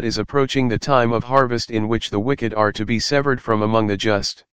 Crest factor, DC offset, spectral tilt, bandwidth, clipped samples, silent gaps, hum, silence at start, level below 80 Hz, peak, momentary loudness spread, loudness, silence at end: 18 dB; 2%; -5.5 dB/octave; 15.5 kHz; under 0.1%; none; none; 0 s; -44 dBFS; 0 dBFS; 4 LU; -19 LUFS; 0 s